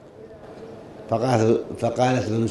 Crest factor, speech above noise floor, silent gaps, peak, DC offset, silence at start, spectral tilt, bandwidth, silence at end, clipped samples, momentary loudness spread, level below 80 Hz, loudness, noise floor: 18 dB; 22 dB; none; -6 dBFS; under 0.1%; 0.05 s; -6.5 dB/octave; 11.5 kHz; 0 s; under 0.1%; 22 LU; -58 dBFS; -22 LUFS; -43 dBFS